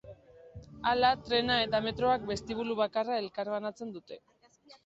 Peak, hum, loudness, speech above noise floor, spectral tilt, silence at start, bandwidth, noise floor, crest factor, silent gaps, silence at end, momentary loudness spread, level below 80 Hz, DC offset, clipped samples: -14 dBFS; none; -30 LUFS; 29 dB; -5 dB/octave; 0.05 s; 8 kHz; -60 dBFS; 18 dB; none; 0.1 s; 20 LU; -58 dBFS; under 0.1%; under 0.1%